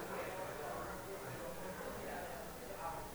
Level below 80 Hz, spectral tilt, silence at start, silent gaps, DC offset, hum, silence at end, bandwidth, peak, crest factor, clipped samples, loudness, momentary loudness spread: -62 dBFS; -4 dB/octave; 0 s; none; under 0.1%; none; 0 s; 19 kHz; -32 dBFS; 14 dB; under 0.1%; -46 LUFS; 3 LU